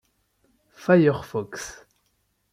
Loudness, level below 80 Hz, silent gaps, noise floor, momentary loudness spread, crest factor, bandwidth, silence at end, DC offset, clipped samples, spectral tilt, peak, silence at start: -22 LUFS; -60 dBFS; none; -71 dBFS; 18 LU; 18 dB; 15.5 kHz; 0.8 s; under 0.1%; under 0.1%; -6.5 dB/octave; -6 dBFS; 0.8 s